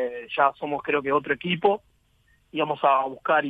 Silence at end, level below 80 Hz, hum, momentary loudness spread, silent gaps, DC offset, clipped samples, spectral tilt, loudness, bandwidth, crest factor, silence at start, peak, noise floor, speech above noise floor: 0 s; -64 dBFS; none; 8 LU; none; under 0.1%; under 0.1%; -7.5 dB/octave; -24 LUFS; 4.8 kHz; 18 dB; 0 s; -6 dBFS; -63 dBFS; 39 dB